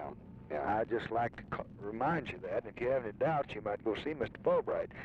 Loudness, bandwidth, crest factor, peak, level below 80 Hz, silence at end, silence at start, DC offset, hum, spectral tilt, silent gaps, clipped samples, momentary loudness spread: -36 LUFS; 7.8 kHz; 14 dB; -22 dBFS; -60 dBFS; 0 s; 0 s; under 0.1%; none; -8 dB/octave; none; under 0.1%; 10 LU